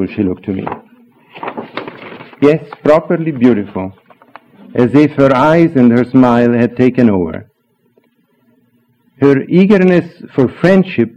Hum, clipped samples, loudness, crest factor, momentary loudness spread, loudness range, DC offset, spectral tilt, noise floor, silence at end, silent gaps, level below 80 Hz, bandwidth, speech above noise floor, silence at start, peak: none; 0.2%; -11 LUFS; 12 dB; 17 LU; 5 LU; under 0.1%; -9 dB/octave; -56 dBFS; 0.1 s; none; -48 dBFS; 7.6 kHz; 45 dB; 0 s; 0 dBFS